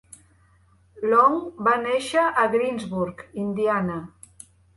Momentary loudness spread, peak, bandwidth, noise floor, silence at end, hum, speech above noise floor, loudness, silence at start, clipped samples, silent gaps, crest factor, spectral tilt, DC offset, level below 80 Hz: 12 LU; -6 dBFS; 11.5 kHz; -58 dBFS; 0.7 s; none; 36 dB; -23 LUFS; 0.95 s; under 0.1%; none; 18 dB; -5.5 dB/octave; under 0.1%; -60 dBFS